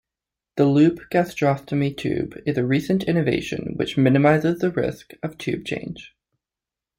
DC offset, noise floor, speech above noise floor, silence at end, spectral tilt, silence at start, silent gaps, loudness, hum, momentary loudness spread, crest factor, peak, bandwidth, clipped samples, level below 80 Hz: under 0.1%; -89 dBFS; 68 dB; 0.9 s; -7.5 dB/octave; 0.55 s; none; -21 LUFS; none; 13 LU; 18 dB; -4 dBFS; 16 kHz; under 0.1%; -54 dBFS